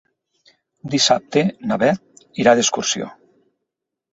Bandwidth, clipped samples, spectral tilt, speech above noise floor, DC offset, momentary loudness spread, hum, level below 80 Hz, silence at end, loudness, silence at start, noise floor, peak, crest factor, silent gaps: 8.2 kHz; under 0.1%; -3.5 dB/octave; 63 dB; under 0.1%; 15 LU; none; -60 dBFS; 1.05 s; -18 LUFS; 0.85 s; -81 dBFS; -2 dBFS; 20 dB; none